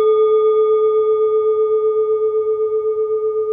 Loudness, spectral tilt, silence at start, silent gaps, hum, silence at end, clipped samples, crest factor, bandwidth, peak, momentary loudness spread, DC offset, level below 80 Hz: -16 LUFS; -7.5 dB/octave; 0 s; none; none; 0 s; under 0.1%; 8 dB; 3.6 kHz; -8 dBFS; 5 LU; under 0.1%; -64 dBFS